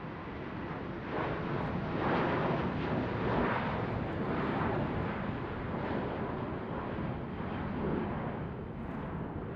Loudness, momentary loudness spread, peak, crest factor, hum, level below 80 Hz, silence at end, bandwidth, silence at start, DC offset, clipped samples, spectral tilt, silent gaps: -35 LUFS; 8 LU; -18 dBFS; 16 dB; none; -50 dBFS; 0 s; 6.6 kHz; 0 s; under 0.1%; under 0.1%; -9 dB/octave; none